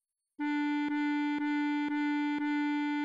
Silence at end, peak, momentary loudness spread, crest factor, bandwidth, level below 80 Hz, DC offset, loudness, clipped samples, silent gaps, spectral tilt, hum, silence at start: 0 s; -24 dBFS; 1 LU; 8 dB; 7.4 kHz; -82 dBFS; under 0.1%; -32 LUFS; under 0.1%; none; -4 dB/octave; none; 0.4 s